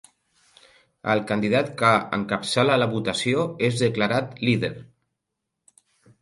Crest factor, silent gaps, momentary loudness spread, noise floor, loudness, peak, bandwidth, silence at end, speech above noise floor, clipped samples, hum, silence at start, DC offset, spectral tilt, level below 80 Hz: 20 dB; none; 6 LU; -82 dBFS; -23 LUFS; -4 dBFS; 11.5 kHz; 1.35 s; 59 dB; under 0.1%; none; 1.05 s; under 0.1%; -5.5 dB/octave; -60 dBFS